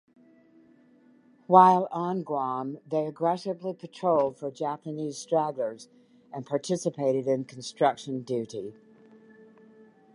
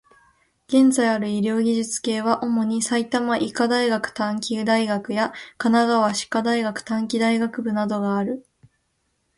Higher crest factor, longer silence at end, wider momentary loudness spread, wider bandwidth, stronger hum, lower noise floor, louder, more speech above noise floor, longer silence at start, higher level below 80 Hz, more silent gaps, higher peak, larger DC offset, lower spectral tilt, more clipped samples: first, 24 dB vs 16 dB; first, 1.4 s vs 0.95 s; first, 16 LU vs 7 LU; about the same, 11 kHz vs 11.5 kHz; neither; second, -59 dBFS vs -71 dBFS; second, -27 LUFS vs -22 LUFS; second, 32 dB vs 50 dB; first, 1.5 s vs 0.7 s; second, -78 dBFS vs -64 dBFS; neither; about the same, -4 dBFS vs -6 dBFS; neither; first, -6 dB/octave vs -4.5 dB/octave; neither